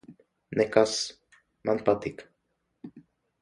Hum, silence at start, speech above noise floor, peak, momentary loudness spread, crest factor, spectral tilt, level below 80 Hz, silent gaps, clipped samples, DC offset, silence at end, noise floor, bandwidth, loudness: none; 0.1 s; 51 dB; -6 dBFS; 25 LU; 24 dB; -4 dB/octave; -64 dBFS; none; under 0.1%; under 0.1%; 0.4 s; -77 dBFS; 11.5 kHz; -27 LUFS